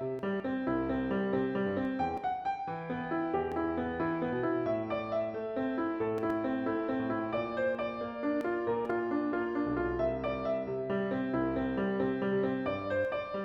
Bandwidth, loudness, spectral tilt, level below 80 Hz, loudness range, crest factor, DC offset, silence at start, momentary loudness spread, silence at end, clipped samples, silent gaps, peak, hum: 6.6 kHz; -33 LUFS; -8.5 dB/octave; -56 dBFS; 1 LU; 12 dB; under 0.1%; 0 s; 3 LU; 0 s; under 0.1%; none; -20 dBFS; none